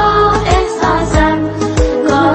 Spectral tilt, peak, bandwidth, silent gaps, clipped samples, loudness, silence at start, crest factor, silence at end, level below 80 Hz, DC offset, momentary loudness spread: -5.5 dB/octave; 0 dBFS; 8.8 kHz; none; under 0.1%; -12 LUFS; 0 s; 12 dB; 0 s; -20 dBFS; under 0.1%; 4 LU